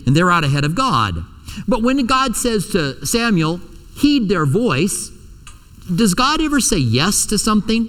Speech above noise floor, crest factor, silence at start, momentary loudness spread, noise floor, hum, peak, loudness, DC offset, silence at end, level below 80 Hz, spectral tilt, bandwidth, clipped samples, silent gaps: 23 dB; 16 dB; 0 s; 8 LU; -39 dBFS; none; -2 dBFS; -16 LUFS; under 0.1%; 0 s; -34 dBFS; -4.5 dB/octave; 18 kHz; under 0.1%; none